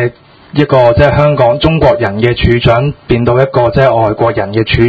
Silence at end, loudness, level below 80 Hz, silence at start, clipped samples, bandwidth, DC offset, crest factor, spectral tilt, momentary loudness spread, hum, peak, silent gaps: 0 s; -10 LUFS; -26 dBFS; 0 s; 1%; 7.4 kHz; under 0.1%; 10 dB; -8.5 dB/octave; 5 LU; none; 0 dBFS; none